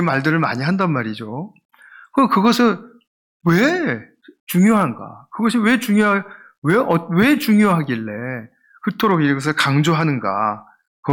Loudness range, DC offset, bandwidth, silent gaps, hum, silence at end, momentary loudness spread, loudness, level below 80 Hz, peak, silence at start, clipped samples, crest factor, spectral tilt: 2 LU; under 0.1%; 18 kHz; 1.65-1.69 s, 3.07-3.40 s, 4.40-4.47 s, 6.58-6.62 s, 10.87-11.03 s; none; 0 s; 14 LU; -17 LUFS; -60 dBFS; -4 dBFS; 0 s; under 0.1%; 14 dB; -6 dB/octave